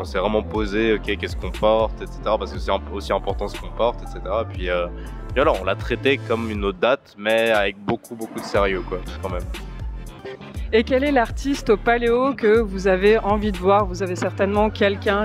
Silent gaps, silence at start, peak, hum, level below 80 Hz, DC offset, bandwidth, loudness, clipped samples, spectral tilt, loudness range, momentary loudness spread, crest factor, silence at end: none; 0 s; -4 dBFS; none; -34 dBFS; under 0.1%; 15 kHz; -21 LUFS; under 0.1%; -6 dB/octave; 6 LU; 12 LU; 16 dB; 0 s